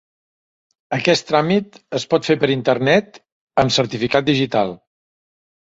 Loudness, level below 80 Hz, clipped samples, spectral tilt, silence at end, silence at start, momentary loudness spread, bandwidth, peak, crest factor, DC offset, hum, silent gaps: -18 LUFS; -54 dBFS; under 0.1%; -5 dB/octave; 1 s; 0.9 s; 8 LU; 8 kHz; -2 dBFS; 18 dB; under 0.1%; none; 3.32-3.47 s